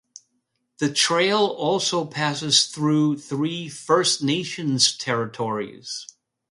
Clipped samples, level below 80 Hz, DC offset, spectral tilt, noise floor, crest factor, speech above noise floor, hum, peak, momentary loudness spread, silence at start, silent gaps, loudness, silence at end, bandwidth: under 0.1%; -68 dBFS; under 0.1%; -3.5 dB/octave; -74 dBFS; 20 dB; 51 dB; none; -2 dBFS; 11 LU; 0.8 s; none; -21 LUFS; 0.45 s; 11.5 kHz